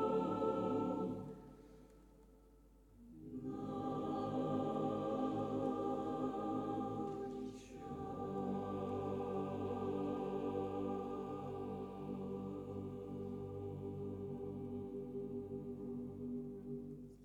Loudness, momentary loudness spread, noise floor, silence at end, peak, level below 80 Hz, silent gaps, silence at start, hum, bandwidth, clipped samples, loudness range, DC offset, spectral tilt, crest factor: -43 LUFS; 9 LU; -65 dBFS; 0 s; -26 dBFS; -66 dBFS; none; 0 s; none; 11 kHz; under 0.1%; 6 LU; under 0.1%; -8.5 dB/octave; 16 dB